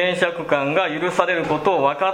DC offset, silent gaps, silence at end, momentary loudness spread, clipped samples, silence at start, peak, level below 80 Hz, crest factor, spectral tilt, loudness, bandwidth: under 0.1%; none; 0 s; 2 LU; under 0.1%; 0 s; 0 dBFS; -58 dBFS; 20 dB; -5 dB/octave; -20 LUFS; 11.5 kHz